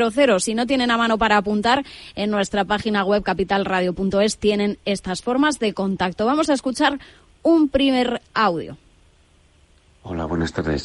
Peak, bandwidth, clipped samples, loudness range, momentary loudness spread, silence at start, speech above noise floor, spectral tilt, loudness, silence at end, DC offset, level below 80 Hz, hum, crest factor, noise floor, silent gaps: -2 dBFS; 11.5 kHz; under 0.1%; 2 LU; 7 LU; 0 s; 35 dB; -4.5 dB/octave; -20 LUFS; 0 s; under 0.1%; -44 dBFS; none; 18 dB; -55 dBFS; none